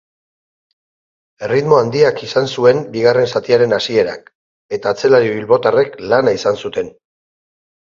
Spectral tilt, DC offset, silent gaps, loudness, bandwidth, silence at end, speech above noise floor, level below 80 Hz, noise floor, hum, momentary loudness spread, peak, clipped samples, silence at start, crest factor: -5.5 dB/octave; under 0.1%; 4.35-4.69 s; -14 LUFS; 7.4 kHz; 0.95 s; over 76 dB; -56 dBFS; under -90 dBFS; none; 10 LU; 0 dBFS; under 0.1%; 1.4 s; 16 dB